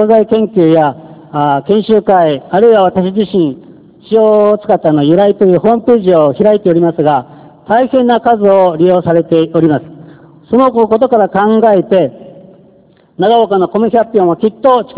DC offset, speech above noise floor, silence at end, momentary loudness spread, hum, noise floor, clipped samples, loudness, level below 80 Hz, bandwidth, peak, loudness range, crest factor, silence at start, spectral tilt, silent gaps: under 0.1%; 37 dB; 0 s; 6 LU; none; -45 dBFS; 1%; -10 LUFS; -50 dBFS; 4 kHz; 0 dBFS; 2 LU; 10 dB; 0 s; -11 dB/octave; none